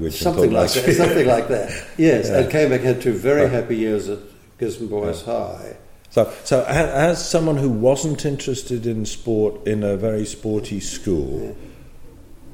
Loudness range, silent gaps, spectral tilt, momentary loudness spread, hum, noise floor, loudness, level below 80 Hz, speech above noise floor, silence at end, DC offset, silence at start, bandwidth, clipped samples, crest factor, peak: 6 LU; none; -5.5 dB/octave; 11 LU; none; -39 dBFS; -20 LUFS; -40 dBFS; 20 dB; 0.05 s; under 0.1%; 0 s; 16.5 kHz; under 0.1%; 16 dB; -4 dBFS